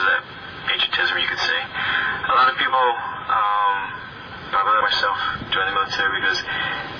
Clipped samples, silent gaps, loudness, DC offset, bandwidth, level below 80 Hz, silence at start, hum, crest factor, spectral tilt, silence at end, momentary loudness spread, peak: under 0.1%; none; -20 LUFS; under 0.1%; 5.4 kHz; -52 dBFS; 0 s; none; 14 dB; -2.5 dB/octave; 0 s; 9 LU; -8 dBFS